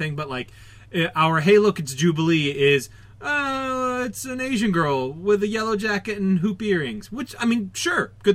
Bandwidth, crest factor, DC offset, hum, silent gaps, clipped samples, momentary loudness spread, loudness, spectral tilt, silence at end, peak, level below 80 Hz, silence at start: 16 kHz; 16 dB; under 0.1%; none; none; under 0.1%; 11 LU; -22 LUFS; -5 dB/octave; 0 s; -6 dBFS; -54 dBFS; 0 s